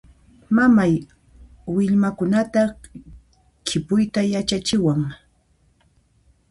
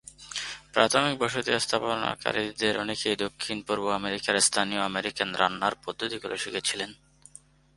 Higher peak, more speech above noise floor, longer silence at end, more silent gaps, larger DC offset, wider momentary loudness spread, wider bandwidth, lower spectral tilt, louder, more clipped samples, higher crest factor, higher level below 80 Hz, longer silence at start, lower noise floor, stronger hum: about the same, -6 dBFS vs -4 dBFS; first, 42 dB vs 27 dB; first, 1.35 s vs 0.8 s; neither; neither; about the same, 11 LU vs 10 LU; about the same, 11.5 kHz vs 11.5 kHz; first, -6 dB/octave vs -2 dB/octave; first, -20 LUFS vs -27 LUFS; neither; second, 16 dB vs 26 dB; first, -50 dBFS vs -62 dBFS; first, 0.5 s vs 0.05 s; first, -61 dBFS vs -54 dBFS; neither